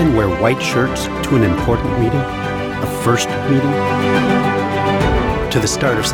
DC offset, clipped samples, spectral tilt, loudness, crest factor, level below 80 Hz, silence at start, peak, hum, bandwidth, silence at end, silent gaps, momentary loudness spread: under 0.1%; under 0.1%; -5.5 dB/octave; -16 LUFS; 16 dB; -30 dBFS; 0 s; 0 dBFS; none; 19 kHz; 0 s; none; 5 LU